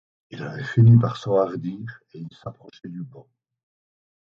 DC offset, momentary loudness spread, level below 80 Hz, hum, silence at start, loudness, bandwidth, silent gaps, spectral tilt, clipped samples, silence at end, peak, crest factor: under 0.1%; 25 LU; -56 dBFS; none; 0.3 s; -20 LUFS; 6.8 kHz; none; -9 dB/octave; under 0.1%; 1.1 s; -4 dBFS; 18 dB